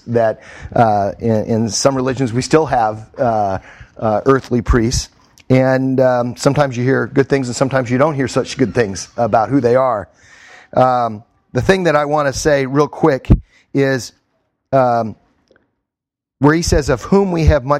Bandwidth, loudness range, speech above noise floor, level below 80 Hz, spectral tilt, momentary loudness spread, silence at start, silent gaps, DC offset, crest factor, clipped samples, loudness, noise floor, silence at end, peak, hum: 14.5 kHz; 2 LU; 69 dB; -30 dBFS; -6 dB/octave; 7 LU; 0.05 s; none; under 0.1%; 16 dB; under 0.1%; -15 LUFS; -84 dBFS; 0 s; 0 dBFS; none